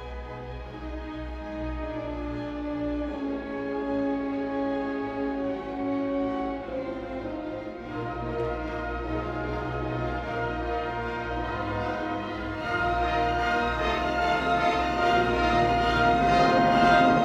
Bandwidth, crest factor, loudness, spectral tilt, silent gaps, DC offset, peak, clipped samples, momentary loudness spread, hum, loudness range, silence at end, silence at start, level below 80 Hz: 10.5 kHz; 18 dB; -27 LUFS; -6.5 dB/octave; none; under 0.1%; -8 dBFS; under 0.1%; 13 LU; none; 9 LU; 0 s; 0 s; -40 dBFS